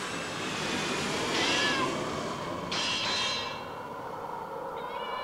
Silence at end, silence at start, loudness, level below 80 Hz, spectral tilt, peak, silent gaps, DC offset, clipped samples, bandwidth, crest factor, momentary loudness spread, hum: 0 s; 0 s; -31 LUFS; -60 dBFS; -2.5 dB/octave; -16 dBFS; none; under 0.1%; under 0.1%; 16 kHz; 16 dB; 12 LU; none